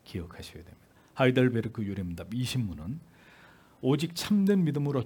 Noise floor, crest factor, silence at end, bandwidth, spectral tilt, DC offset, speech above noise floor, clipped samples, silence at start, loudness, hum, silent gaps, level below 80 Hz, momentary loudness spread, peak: -56 dBFS; 20 dB; 0 s; 18 kHz; -6.5 dB/octave; under 0.1%; 28 dB; under 0.1%; 0.1 s; -29 LUFS; none; none; -60 dBFS; 19 LU; -10 dBFS